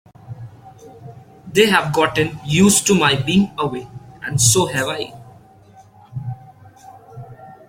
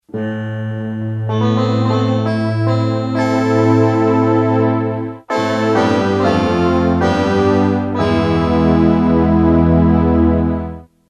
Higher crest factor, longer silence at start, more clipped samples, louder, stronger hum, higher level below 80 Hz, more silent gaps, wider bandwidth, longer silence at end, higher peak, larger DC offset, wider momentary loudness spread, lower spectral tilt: about the same, 18 dB vs 14 dB; about the same, 0.25 s vs 0.15 s; neither; about the same, -16 LUFS vs -15 LUFS; neither; second, -50 dBFS vs -30 dBFS; neither; first, 16.5 kHz vs 9.2 kHz; about the same, 0.15 s vs 0.25 s; about the same, 0 dBFS vs 0 dBFS; neither; first, 25 LU vs 10 LU; second, -3.5 dB/octave vs -8 dB/octave